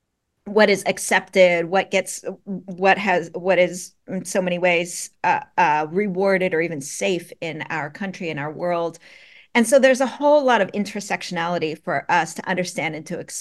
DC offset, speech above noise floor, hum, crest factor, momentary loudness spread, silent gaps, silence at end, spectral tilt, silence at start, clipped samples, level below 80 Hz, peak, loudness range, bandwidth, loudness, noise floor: under 0.1%; 21 dB; none; 20 dB; 13 LU; none; 0 s; -4 dB/octave; 0.45 s; under 0.1%; -68 dBFS; -2 dBFS; 4 LU; 12.5 kHz; -21 LUFS; -42 dBFS